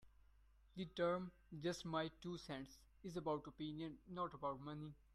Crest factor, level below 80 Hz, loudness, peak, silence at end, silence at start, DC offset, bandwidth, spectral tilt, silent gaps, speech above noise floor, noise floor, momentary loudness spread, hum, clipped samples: 18 dB; -70 dBFS; -47 LUFS; -30 dBFS; 0.2 s; 0 s; under 0.1%; 13 kHz; -6 dB/octave; none; 24 dB; -71 dBFS; 11 LU; none; under 0.1%